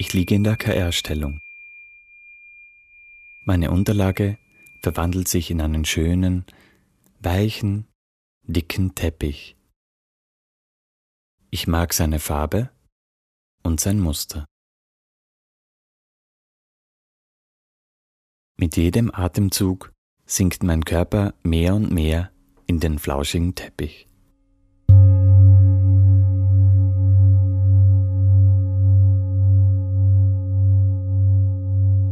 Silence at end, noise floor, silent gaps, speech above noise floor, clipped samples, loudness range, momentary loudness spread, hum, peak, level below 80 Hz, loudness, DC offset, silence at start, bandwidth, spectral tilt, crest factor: 0 s; -60 dBFS; 7.95-8.41 s, 9.76-11.38 s, 12.92-13.58 s, 14.51-18.55 s, 19.98-20.17 s; 39 dB; under 0.1%; 12 LU; 14 LU; none; -2 dBFS; -34 dBFS; -19 LUFS; under 0.1%; 0 s; 14.5 kHz; -6 dB/octave; 16 dB